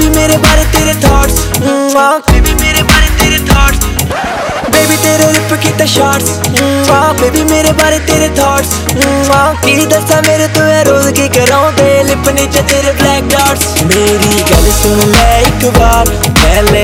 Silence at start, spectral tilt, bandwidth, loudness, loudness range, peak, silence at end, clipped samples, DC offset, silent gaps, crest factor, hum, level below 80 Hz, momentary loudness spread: 0 s; -4 dB/octave; 20 kHz; -8 LUFS; 1 LU; 0 dBFS; 0 s; 2%; under 0.1%; none; 8 dB; none; -16 dBFS; 3 LU